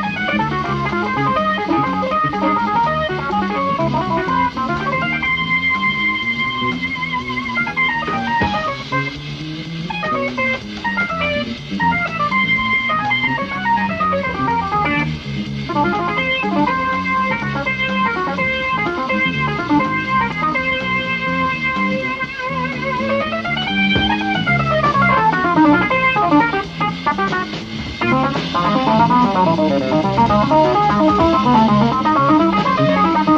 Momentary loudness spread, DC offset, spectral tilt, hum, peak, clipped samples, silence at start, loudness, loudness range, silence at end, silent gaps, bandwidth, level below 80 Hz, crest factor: 7 LU; under 0.1%; -6.5 dB/octave; none; 0 dBFS; under 0.1%; 0 s; -17 LUFS; 5 LU; 0 s; none; 8.2 kHz; -40 dBFS; 16 dB